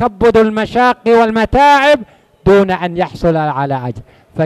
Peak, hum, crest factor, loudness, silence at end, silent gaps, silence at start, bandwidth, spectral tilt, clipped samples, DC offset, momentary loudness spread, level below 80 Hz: 0 dBFS; none; 12 dB; -12 LUFS; 0 s; none; 0 s; 13 kHz; -6.5 dB/octave; under 0.1%; under 0.1%; 10 LU; -34 dBFS